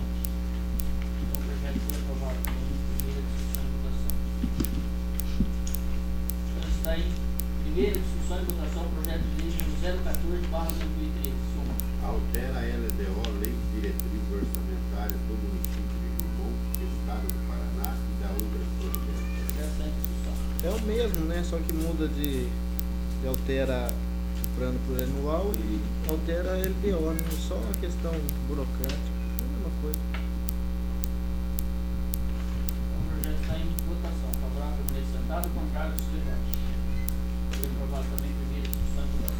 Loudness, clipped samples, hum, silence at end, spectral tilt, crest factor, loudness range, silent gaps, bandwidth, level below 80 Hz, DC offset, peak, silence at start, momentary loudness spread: -31 LUFS; under 0.1%; 60 Hz at -30 dBFS; 0 s; -6 dB/octave; 26 dB; 2 LU; none; over 20 kHz; -30 dBFS; under 0.1%; -2 dBFS; 0 s; 3 LU